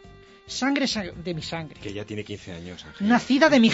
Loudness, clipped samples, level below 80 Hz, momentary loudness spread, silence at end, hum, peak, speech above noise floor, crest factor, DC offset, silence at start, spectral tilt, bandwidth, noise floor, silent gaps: -24 LUFS; under 0.1%; -54 dBFS; 18 LU; 0 s; none; -6 dBFS; 25 dB; 18 dB; under 0.1%; 0.05 s; -4.5 dB/octave; 8 kHz; -48 dBFS; none